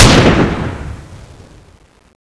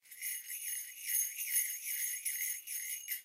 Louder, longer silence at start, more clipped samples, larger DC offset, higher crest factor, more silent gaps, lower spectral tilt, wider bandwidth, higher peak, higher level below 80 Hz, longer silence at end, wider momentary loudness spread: first, -11 LUFS vs -36 LUFS; about the same, 0 s vs 0.05 s; first, 0.7% vs under 0.1%; neither; second, 14 dB vs 20 dB; neither; first, -4.5 dB/octave vs 7.5 dB/octave; second, 11 kHz vs 16 kHz; first, 0 dBFS vs -20 dBFS; first, -22 dBFS vs under -90 dBFS; first, 1.15 s vs 0 s; first, 22 LU vs 7 LU